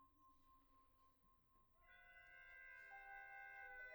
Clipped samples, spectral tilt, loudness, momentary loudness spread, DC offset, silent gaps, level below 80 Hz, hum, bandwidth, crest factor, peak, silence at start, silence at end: under 0.1%; -3 dB/octave; -60 LUFS; 9 LU; under 0.1%; none; -80 dBFS; none; over 20 kHz; 16 dB; -48 dBFS; 0 s; 0 s